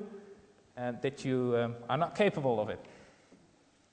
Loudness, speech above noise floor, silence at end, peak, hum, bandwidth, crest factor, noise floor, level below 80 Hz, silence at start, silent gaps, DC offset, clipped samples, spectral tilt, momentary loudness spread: -33 LUFS; 34 dB; 0.9 s; -16 dBFS; none; 9.4 kHz; 18 dB; -66 dBFS; -72 dBFS; 0 s; none; under 0.1%; under 0.1%; -6.5 dB/octave; 17 LU